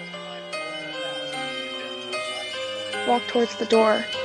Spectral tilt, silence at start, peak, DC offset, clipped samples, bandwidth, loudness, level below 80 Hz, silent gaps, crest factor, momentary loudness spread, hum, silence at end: -3 dB/octave; 0 s; -6 dBFS; under 0.1%; under 0.1%; 12 kHz; -26 LUFS; -72 dBFS; none; 18 dB; 12 LU; none; 0 s